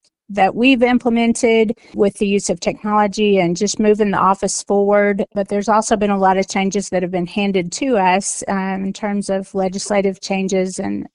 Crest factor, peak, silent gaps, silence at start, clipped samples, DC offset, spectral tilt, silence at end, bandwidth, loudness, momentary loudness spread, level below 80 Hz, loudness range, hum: 16 dB; 0 dBFS; none; 0.3 s; under 0.1%; under 0.1%; -4.5 dB/octave; 0.1 s; 11.5 kHz; -17 LUFS; 7 LU; -48 dBFS; 3 LU; none